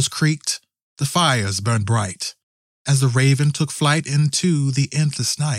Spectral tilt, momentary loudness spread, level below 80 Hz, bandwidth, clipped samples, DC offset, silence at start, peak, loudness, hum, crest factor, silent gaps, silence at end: -4.5 dB/octave; 9 LU; -60 dBFS; 15 kHz; under 0.1%; under 0.1%; 0 s; -4 dBFS; -19 LUFS; none; 16 dB; 0.82-0.96 s, 2.43-2.85 s; 0 s